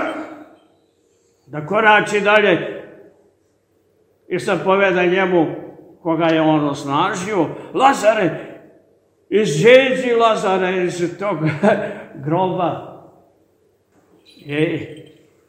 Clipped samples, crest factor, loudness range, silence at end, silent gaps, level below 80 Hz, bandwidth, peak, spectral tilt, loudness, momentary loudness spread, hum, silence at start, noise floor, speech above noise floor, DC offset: under 0.1%; 18 dB; 6 LU; 0.45 s; none; -64 dBFS; 16 kHz; 0 dBFS; -5.5 dB/octave; -17 LUFS; 17 LU; none; 0 s; -61 dBFS; 45 dB; under 0.1%